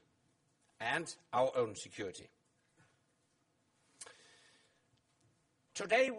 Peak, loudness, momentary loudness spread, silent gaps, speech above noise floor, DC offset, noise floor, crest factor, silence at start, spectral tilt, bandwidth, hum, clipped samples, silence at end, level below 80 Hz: -20 dBFS; -38 LUFS; 20 LU; none; 41 dB; under 0.1%; -78 dBFS; 22 dB; 0.8 s; -3 dB/octave; 11.5 kHz; none; under 0.1%; 0 s; -82 dBFS